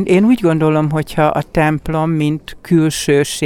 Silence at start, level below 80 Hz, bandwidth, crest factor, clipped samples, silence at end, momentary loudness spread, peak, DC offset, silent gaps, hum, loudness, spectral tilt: 0 s; -38 dBFS; 17 kHz; 12 dB; under 0.1%; 0 s; 5 LU; -2 dBFS; under 0.1%; none; none; -15 LUFS; -6 dB/octave